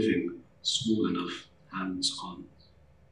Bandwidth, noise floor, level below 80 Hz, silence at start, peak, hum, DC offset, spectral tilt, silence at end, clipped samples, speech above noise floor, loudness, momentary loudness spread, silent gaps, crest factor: 11.5 kHz; -60 dBFS; -64 dBFS; 0 s; -16 dBFS; none; under 0.1%; -3.5 dB/octave; 0.65 s; under 0.1%; 29 dB; -31 LUFS; 15 LU; none; 18 dB